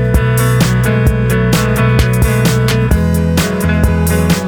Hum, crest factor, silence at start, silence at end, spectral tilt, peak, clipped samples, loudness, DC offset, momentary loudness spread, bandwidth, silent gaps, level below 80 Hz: none; 10 dB; 0 s; 0 s; -6 dB/octave; 0 dBFS; under 0.1%; -12 LUFS; under 0.1%; 2 LU; 19.5 kHz; none; -20 dBFS